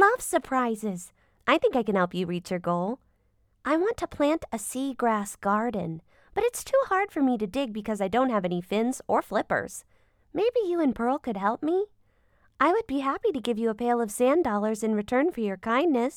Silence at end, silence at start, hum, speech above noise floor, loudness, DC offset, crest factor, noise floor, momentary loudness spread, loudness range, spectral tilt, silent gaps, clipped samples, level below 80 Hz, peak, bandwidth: 0 s; 0 s; none; 41 dB; -27 LUFS; under 0.1%; 20 dB; -67 dBFS; 9 LU; 3 LU; -5 dB/octave; none; under 0.1%; -58 dBFS; -6 dBFS; 19 kHz